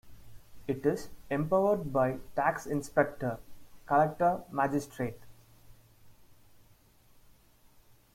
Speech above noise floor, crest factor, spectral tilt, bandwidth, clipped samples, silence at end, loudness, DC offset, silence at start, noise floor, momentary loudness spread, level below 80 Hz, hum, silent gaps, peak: 31 dB; 22 dB; -7 dB/octave; 16.5 kHz; under 0.1%; 2.05 s; -31 LUFS; under 0.1%; 0.05 s; -61 dBFS; 10 LU; -58 dBFS; none; none; -12 dBFS